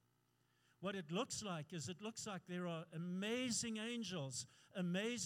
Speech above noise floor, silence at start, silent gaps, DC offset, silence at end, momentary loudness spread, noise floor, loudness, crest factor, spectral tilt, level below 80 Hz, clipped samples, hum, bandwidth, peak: 35 dB; 0.8 s; none; under 0.1%; 0 s; 8 LU; -80 dBFS; -45 LUFS; 18 dB; -4 dB/octave; -84 dBFS; under 0.1%; none; 16 kHz; -28 dBFS